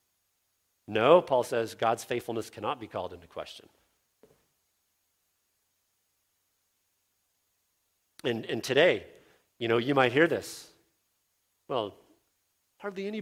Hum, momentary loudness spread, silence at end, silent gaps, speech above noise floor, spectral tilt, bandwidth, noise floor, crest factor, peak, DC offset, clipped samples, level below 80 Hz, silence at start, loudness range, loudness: none; 19 LU; 0 s; none; 49 dB; -5 dB/octave; 16 kHz; -77 dBFS; 24 dB; -6 dBFS; under 0.1%; under 0.1%; -72 dBFS; 0.9 s; 14 LU; -28 LUFS